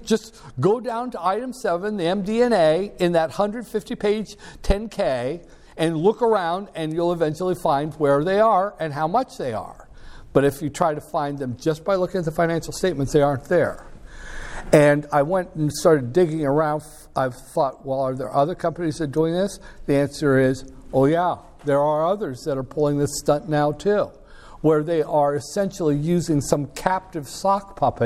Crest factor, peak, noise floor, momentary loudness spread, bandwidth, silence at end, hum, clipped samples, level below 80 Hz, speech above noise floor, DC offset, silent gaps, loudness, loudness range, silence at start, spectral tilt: 22 dB; 0 dBFS; -40 dBFS; 9 LU; 16 kHz; 0 s; none; under 0.1%; -42 dBFS; 19 dB; under 0.1%; none; -22 LUFS; 3 LU; 0 s; -6 dB/octave